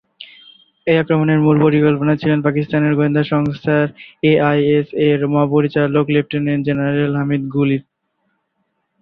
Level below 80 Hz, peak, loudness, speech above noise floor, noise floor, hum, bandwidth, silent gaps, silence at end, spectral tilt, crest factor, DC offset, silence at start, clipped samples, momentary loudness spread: -52 dBFS; -2 dBFS; -16 LUFS; 54 dB; -69 dBFS; none; 5.2 kHz; none; 1.2 s; -10.5 dB/octave; 14 dB; under 0.1%; 0.2 s; under 0.1%; 6 LU